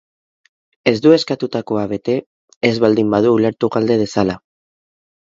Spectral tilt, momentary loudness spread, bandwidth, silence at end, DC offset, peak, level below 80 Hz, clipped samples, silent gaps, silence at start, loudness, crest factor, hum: -6.5 dB/octave; 8 LU; 7.8 kHz; 1 s; under 0.1%; 0 dBFS; -54 dBFS; under 0.1%; 2.26-2.48 s, 2.56-2.61 s; 0.85 s; -16 LUFS; 16 dB; none